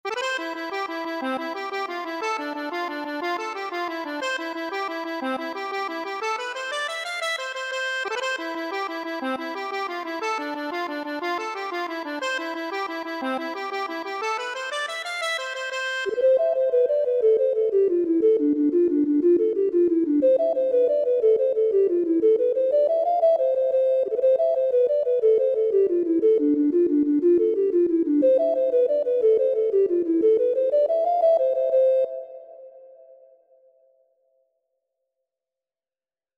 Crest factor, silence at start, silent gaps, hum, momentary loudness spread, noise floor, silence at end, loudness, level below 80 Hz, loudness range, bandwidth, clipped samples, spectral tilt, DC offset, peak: 12 dB; 0.05 s; none; none; 9 LU; under -90 dBFS; 3.5 s; -23 LUFS; -70 dBFS; 8 LU; 13.5 kHz; under 0.1%; -3 dB/octave; under 0.1%; -10 dBFS